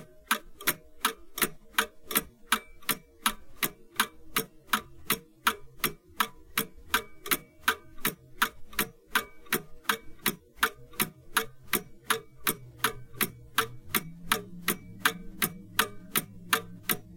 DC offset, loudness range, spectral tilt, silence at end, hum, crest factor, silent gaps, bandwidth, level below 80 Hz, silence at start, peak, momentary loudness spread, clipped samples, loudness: under 0.1%; 1 LU; -1.5 dB/octave; 0 s; none; 28 dB; none; 17 kHz; -54 dBFS; 0 s; -6 dBFS; 4 LU; under 0.1%; -31 LUFS